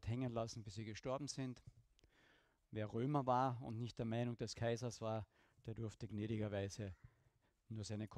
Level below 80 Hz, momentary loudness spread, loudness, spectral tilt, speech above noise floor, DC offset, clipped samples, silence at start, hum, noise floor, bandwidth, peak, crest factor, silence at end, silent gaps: -70 dBFS; 13 LU; -45 LUFS; -6 dB/octave; 35 dB; under 0.1%; under 0.1%; 0 s; none; -79 dBFS; 11 kHz; -26 dBFS; 20 dB; 0 s; none